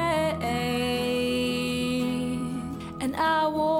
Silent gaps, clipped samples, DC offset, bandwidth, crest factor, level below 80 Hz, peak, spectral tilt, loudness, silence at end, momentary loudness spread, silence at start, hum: none; under 0.1%; under 0.1%; 16.5 kHz; 12 dB; -50 dBFS; -14 dBFS; -5 dB/octave; -27 LUFS; 0 s; 8 LU; 0 s; none